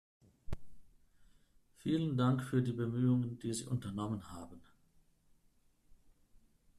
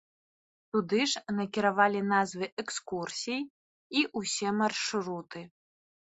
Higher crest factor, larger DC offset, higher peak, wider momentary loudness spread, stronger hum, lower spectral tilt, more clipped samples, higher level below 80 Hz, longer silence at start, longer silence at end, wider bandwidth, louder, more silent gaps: about the same, 18 dB vs 22 dB; neither; second, -20 dBFS vs -10 dBFS; first, 18 LU vs 11 LU; neither; first, -7 dB/octave vs -3.5 dB/octave; neither; first, -60 dBFS vs -74 dBFS; second, 0.5 s vs 0.75 s; first, 2.15 s vs 0.65 s; first, 13 kHz vs 8.2 kHz; second, -36 LUFS vs -30 LUFS; second, none vs 2.52-2.57 s, 3.50-3.90 s